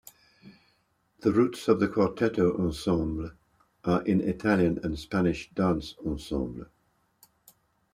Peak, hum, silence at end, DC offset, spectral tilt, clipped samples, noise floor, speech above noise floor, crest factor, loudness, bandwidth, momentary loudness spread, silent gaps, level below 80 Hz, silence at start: -8 dBFS; none; 1.3 s; under 0.1%; -7 dB/octave; under 0.1%; -70 dBFS; 44 dB; 20 dB; -28 LUFS; 15 kHz; 10 LU; none; -50 dBFS; 0.45 s